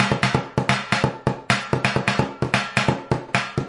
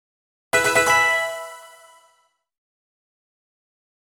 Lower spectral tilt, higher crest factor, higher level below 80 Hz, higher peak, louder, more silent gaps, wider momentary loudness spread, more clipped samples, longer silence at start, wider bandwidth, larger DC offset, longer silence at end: first, -5 dB/octave vs -1 dB/octave; about the same, 20 dB vs 20 dB; first, -48 dBFS vs -60 dBFS; about the same, -2 dBFS vs -4 dBFS; second, -22 LUFS vs -18 LUFS; neither; second, 4 LU vs 17 LU; neither; second, 0 s vs 0.55 s; second, 11.5 kHz vs over 20 kHz; neither; second, 0 s vs 2.35 s